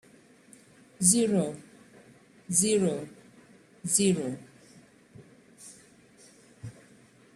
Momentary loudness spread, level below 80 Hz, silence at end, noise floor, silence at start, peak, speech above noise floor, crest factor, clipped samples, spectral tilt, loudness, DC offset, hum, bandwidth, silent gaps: 25 LU; -70 dBFS; 0.65 s; -57 dBFS; 1 s; -6 dBFS; 32 dB; 24 dB; under 0.1%; -4 dB/octave; -26 LUFS; under 0.1%; none; 15 kHz; none